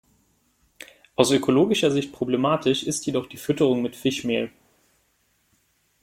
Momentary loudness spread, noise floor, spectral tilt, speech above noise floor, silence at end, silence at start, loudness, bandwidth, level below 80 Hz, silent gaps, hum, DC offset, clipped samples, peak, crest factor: 14 LU; -67 dBFS; -4.5 dB/octave; 45 dB; 1.55 s; 1.2 s; -23 LUFS; 16.5 kHz; -62 dBFS; none; none; under 0.1%; under 0.1%; -2 dBFS; 22 dB